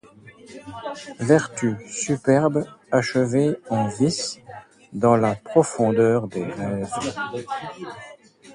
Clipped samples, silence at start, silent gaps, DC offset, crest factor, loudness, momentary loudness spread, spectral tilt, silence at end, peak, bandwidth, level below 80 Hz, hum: under 0.1%; 0.25 s; none; under 0.1%; 20 dB; -22 LUFS; 18 LU; -5.5 dB/octave; 0 s; -2 dBFS; 11.5 kHz; -58 dBFS; none